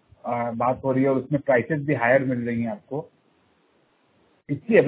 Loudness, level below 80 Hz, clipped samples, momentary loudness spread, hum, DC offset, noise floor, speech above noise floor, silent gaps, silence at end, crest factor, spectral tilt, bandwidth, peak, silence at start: -24 LUFS; -60 dBFS; under 0.1%; 13 LU; none; under 0.1%; -64 dBFS; 41 dB; none; 0 s; 20 dB; -11.5 dB/octave; 4 kHz; -4 dBFS; 0.25 s